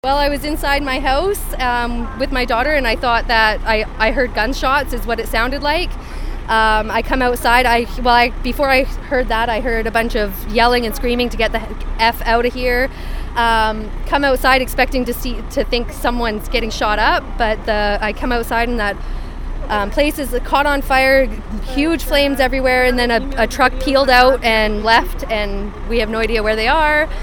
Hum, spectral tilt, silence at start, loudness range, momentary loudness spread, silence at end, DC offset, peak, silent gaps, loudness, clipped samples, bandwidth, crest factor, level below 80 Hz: none; -4.5 dB/octave; 0.05 s; 4 LU; 9 LU; 0 s; 0.8%; 0 dBFS; none; -16 LUFS; under 0.1%; 19.5 kHz; 16 dB; -24 dBFS